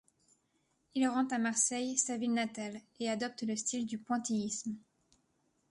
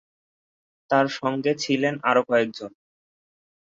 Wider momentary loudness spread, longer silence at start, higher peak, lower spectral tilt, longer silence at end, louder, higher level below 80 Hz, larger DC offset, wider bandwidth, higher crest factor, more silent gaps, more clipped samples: about the same, 11 LU vs 9 LU; about the same, 0.95 s vs 0.9 s; second, -16 dBFS vs -8 dBFS; second, -3 dB/octave vs -5 dB/octave; second, 0.9 s vs 1.1 s; second, -34 LUFS vs -23 LUFS; second, -80 dBFS vs -72 dBFS; neither; first, 11.5 kHz vs 7.8 kHz; about the same, 20 dB vs 18 dB; neither; neither